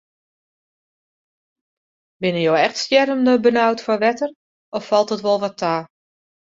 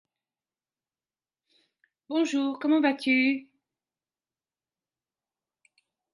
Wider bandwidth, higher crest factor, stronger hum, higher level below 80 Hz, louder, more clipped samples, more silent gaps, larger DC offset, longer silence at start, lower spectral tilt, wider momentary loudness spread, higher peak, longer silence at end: second, 7.8 kHz vs 11.5 kHz; about the same, 18 dB vs 20 dB; neither; first, -66 dBFS vs -84 dBFS; first, -18 LUFS vs -26 LUFS; neither; first, 4.36-4.72 s vs none; neither; about the same, 2.2 s vs 2.1 s; first, -5 dB/octave vs -3 dB/octave; first, 11 LU vs 7 LU; first, -2 dBFS vs -10 dBFS; second, 0.7 s vs 2.7 s